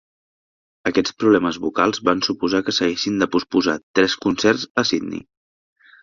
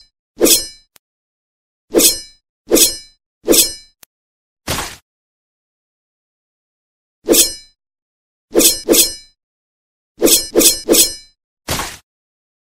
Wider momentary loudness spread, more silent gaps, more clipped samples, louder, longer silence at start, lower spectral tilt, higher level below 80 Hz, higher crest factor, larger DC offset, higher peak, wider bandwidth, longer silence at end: second, 5 LU vs 19 LU; second, 3.83-3.94 s, 4.70-4.75 s vs 0.99-1.88 s, 2.49-2.65 s, 3.26-3.41 s, 4.06-4.56 s, 5.02-7.22 s, 8.02-8.48 s, 9.43-10.15 s, 11.44-11.57 s; second, under 0.1% vs 0.1%; second, -19 LUFS vs -12 LUFS; first, 0.85 s vs 0.4 s; first, -4 dB/octave vs -1 dB/octave; second, -56 dBFS vs -40 dBFS; about the same, 20 dB vs 18 dB; neither; about the same, -2 dBFS vs 0 dBFS; second, 7.4 kHz vs over 20 kHz; about the same, 0.85 s vs 0.85 s